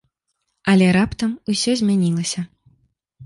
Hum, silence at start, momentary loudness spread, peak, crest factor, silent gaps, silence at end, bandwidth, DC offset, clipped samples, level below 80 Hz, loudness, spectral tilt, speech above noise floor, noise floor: none; 0.65 s; 12 LU; -4 dBFS; 16 dB; none; 0 s; 11.5 kHz; under 0.1%; under 0.1%; -48 dBFS; -19 LUFS; -5 dB/octave; 56 dB; -74 dBFS